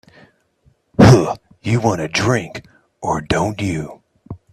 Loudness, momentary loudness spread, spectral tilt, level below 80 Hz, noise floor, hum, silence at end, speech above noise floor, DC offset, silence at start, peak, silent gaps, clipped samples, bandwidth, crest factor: -16 LUFS; 23 LU; -6 dB/octave; -40 dBFS; -58 dBFS; none; 0.2 s; 39 dB; under 0.1%; 1 s; 0 dBFS; none; under 0.1%; 13 kHz; 18 dB